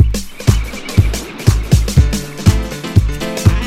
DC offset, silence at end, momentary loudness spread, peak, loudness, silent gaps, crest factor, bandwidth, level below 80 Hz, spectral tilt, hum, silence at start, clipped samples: under 0.1%; 0 s; 5 LU; 0 dBFS; -15 LUFS; none; 14 dB; 16 kHz; -18 dBFS; -5.5 dB/octave; none; 0 s; 0.5%